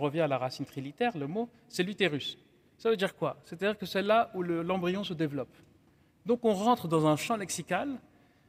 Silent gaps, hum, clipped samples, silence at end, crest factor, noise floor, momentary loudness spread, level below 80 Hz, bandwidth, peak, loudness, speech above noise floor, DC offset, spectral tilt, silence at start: none; none; under 0.1%; 0.5 s; 18 dB; -64 dBFS; 12 LU; -70 dBFS; 16 kHz; -12 dBFS; -31 LUFS; 34 dB; under 0.1%; -5 dB/octave; 0 s